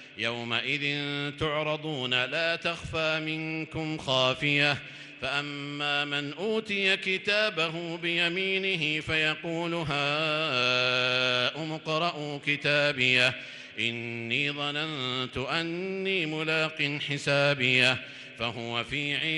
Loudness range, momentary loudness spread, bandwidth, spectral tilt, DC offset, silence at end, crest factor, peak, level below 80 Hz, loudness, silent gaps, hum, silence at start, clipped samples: 3 LU; 9 LU; 11.5 kHz; -4 dB/octave; under 0.1%; 0 s; 20 dB; -10 dBFS; -60 dBFS; -27 LUFS; none; none; 0 s; under 0.1%